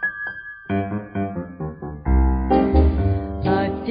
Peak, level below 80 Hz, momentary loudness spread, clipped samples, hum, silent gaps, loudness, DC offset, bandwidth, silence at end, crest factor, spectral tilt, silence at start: -4 dBFS; -24 dBFS; 13 LU; under 0.1%; none; none; -22 LUFS; under 0.1%; 5.2 kHz; 0 s; 16 dB; -12.5 dB/octave; 0 s